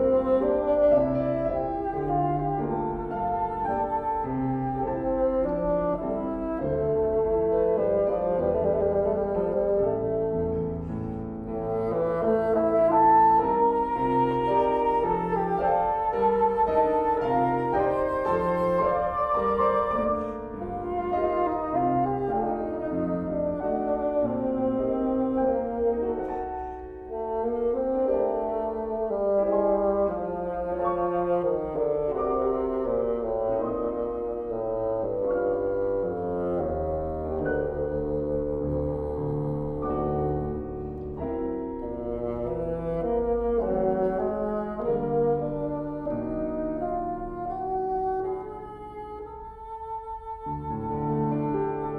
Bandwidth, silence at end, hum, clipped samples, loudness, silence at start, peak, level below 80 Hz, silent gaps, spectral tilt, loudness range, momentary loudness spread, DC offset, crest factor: 5 kHz; 0 s; none; under 0.1%; -26 LUFS; 0 s; -10 dBFS; -44 dBFS; none; -10 dB/octave; 7 LU; 9 LU; under 0.1%; 16 dB